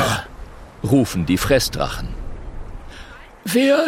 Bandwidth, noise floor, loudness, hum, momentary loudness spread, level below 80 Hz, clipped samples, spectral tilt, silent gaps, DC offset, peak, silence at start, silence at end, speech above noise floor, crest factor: 16.5 kHz; -39 dBFS; -19 LUFS; none; 22 LU; -34 dBFS; under 0.1%; -5 dB/octave; none; under 0.1%; -4 dBFS; 0 s; 0 s; 21 dB; 16 dB